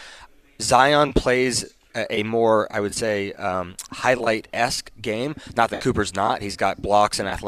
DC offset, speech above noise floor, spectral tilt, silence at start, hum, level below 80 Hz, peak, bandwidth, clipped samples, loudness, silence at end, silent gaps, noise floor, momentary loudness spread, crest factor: under 0.1%; 25 dB; -4 dB/octave; 0 s; none; -42 dBFS; -2 dBFS; 15 kHz; under 0.1%; -22 LUFS; 0 s; none; -47 dBFS; 10 LU; 20 dB